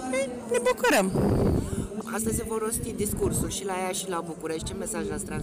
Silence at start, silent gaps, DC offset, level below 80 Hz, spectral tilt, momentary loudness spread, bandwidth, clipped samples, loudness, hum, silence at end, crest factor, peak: 0 s; none; under 0.1%; -40 dBFS; -4.5 dB/octave; 10 LU; 16 kHz; under 0.1%; -28 LUFS; none; 0 s; 12 dB; -16 dBFS